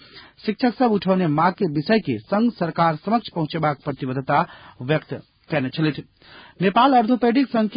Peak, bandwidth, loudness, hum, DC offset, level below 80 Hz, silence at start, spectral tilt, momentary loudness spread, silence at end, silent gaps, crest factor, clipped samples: -6 dBFS; 5.2 kHz; -21 LUFS; none; under 0.1%; -58 dBFS; 0.15 s; -11.5 dB/octave; 10 LU; 0 s; none; 16 dB; under 0.1%